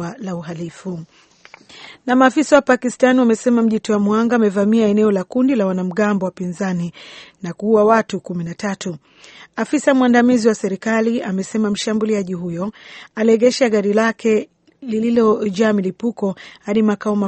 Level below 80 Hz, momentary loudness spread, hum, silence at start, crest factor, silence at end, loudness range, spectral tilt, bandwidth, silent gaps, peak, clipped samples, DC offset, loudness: -60 dBFS; 15 LU; none; 0 s; 18 dB; 0 s; 4 LU; -6 dB/octave; 8.8 kHz; none; 0 dBFS; under 0.1%; under 0.1%; -17 LUFS